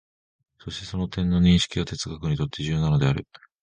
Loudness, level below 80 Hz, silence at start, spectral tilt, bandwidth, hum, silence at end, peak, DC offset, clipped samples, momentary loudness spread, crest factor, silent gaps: -24 LUFS; -40 dBFS; 0.65 s; -6 dB/octave; 9.6 kHz; none; 0.4 s; -6 dBFS; under 0.1%; under 0.1%; 14 LU; 18 dB; none